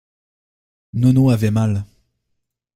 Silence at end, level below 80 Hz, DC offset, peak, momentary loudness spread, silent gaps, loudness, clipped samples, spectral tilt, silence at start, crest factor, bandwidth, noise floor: 0.9 s; -48 dBFS; under 0.1%; -2 dBFS; 12 LU; none; -17 LUFS; under 0.1%; -8.5 dB/octave; 0.95 s; 16 dB; 14.5 kHz; -73 dBFS